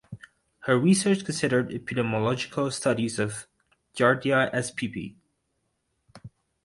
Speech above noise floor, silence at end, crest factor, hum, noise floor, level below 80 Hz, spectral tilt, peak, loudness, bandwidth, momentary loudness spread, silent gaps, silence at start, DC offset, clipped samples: 51 dB; 0.35 s; 20 dB; none; -76 dBFS; -62 dBFS; -5 dB/octave; -6 dBFS; -25 LUFS; 11.5 kHz; 17 LU; none; 0.1 s; under 0.1%; under 0.1%